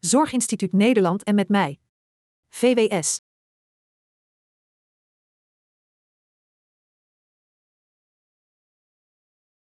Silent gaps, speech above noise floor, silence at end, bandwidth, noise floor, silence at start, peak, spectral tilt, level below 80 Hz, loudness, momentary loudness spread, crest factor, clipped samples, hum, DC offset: 1.89-2.43 s; over 70 dB; 6.45 s; 13.5 kHz; under -90 dBFS; 0.05 s; -8 dBFS; -4.5 dB/octave; -72 dBFS; -21 LUFS; 8 LU; 18 dB; under 0.1%; none; under 0.1%